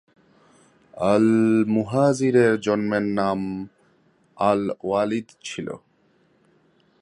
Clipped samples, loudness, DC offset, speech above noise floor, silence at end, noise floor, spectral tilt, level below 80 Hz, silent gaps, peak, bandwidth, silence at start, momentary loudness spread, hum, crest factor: under 0.1%; -22 LUFS; under 0.1%; 41 dB; 1.25 s; -62 dBFS; -6.5 dB/octave; -60 dBFS; none; -6 dBFS; 11 kHz; 0.95 s; 15 LU; none; 18 dB